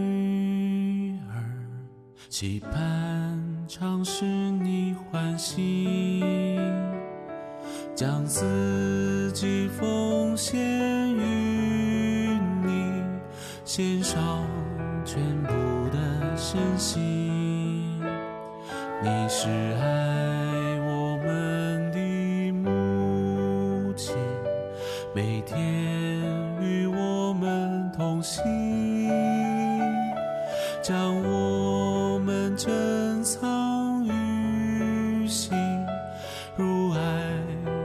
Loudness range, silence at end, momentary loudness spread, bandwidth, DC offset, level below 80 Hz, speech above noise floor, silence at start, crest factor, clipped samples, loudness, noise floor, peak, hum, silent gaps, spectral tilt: 3 LU; 0 s; 7 LU; 14 kHz; under 0.1%; -54 dBFS; 20 dB; 0 s; 14 dB; under 0.1%; -27 LUFS; -47 dBFS; -14 dBFS; none; none; -6 dB/octave